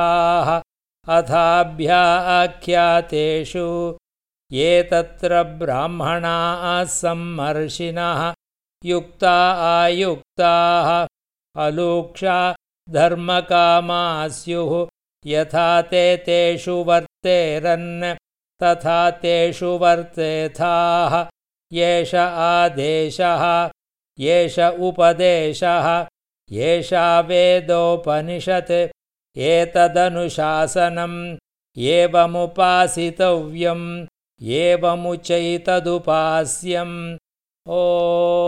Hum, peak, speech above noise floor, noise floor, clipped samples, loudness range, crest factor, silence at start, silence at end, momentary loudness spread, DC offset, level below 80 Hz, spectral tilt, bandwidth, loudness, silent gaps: none; -2 dBFS; over 72 dB; under -90 dBFS; under 0.1%; 3 LU; 16 dB; 0 s; 0 s; 10 LU; under 0.1%; -50 dBFS; -4.5 dB/octave; 12.5 kHz; -18 LUFS; none